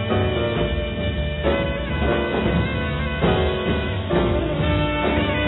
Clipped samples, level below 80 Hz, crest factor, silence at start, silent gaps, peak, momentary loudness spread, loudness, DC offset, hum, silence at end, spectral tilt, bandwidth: under 0.1%; -28 dBFS; 14 dB; 0 s; none; -6 dBFS; 4 LU; -22 LUFS; under 0.1%; none; 0 s; -10.5 dB/octave; 4.1 kHz